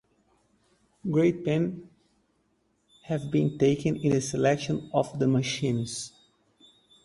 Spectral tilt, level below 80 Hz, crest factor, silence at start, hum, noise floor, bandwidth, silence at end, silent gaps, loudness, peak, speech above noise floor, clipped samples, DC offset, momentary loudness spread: -6 dB/octave; -60 dBFS; 20 dB; 1.05 s; none; -71 dBFS; 11.5 kHz; 0.95 s; none; -27 LUFS; -8 dBFS; 45 dB; under 0.1%; under 0.1%; 10 LU